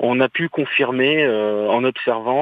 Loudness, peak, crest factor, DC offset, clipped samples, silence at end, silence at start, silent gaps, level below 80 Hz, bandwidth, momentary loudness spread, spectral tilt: -18 LUFS; -4 dBFS; 14 dB; under 0.1%; under 0.1%; 0 s; 0 s; none; -68 dBFS; 4.9 kHz; 4 LU; -8 dB/octave